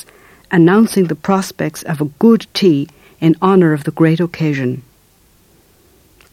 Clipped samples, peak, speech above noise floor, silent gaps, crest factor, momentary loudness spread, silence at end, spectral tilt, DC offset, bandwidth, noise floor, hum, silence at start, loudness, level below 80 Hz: under 0.1%; 0 dBFS; 38 dB; none; 14 dB; 10 LU; 1.5 s; -7 dB/octave; under 0.1%; 16 kHz; -51 dBFS; none; 0.5 s; -14 LUFS; -54 dBFS